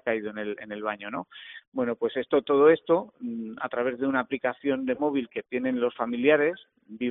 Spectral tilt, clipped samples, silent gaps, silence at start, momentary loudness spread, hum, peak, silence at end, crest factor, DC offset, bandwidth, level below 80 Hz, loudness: -3.5 dB/octave; under 0.1%; 1.68-1.72 s; 0.05 s; 15 LU; none; -8 dBFS; 0 s; 18 dB; under 0.1%; 4 kHz; -70 dBFS; -27 LUFS